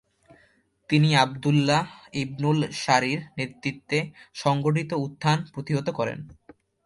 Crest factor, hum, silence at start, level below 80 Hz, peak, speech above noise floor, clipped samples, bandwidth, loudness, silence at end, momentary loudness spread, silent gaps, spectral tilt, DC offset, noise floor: 20 dB; none; 0.9 s; -60 dBFS; -6 dBFS; 39 dB; under 0.1%; 11.5 kHz; -25 LUFS; 0.55 s; 11 LU; none; -5.5 dB/octave; under 0.1%; -63 dBFS